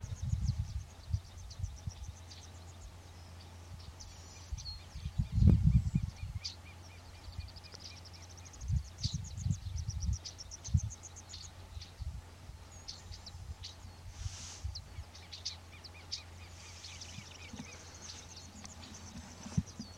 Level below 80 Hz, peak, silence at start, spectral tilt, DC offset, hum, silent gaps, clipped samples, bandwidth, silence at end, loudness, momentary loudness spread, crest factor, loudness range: -44 dBFS; -12 dBFS; 0 s; -5 dB/octave; under 0.1%; none; none; under 0.1%; 13.5 kHz; 0 s; -40 LUFS; 15 LU; 28 dB; 14 LU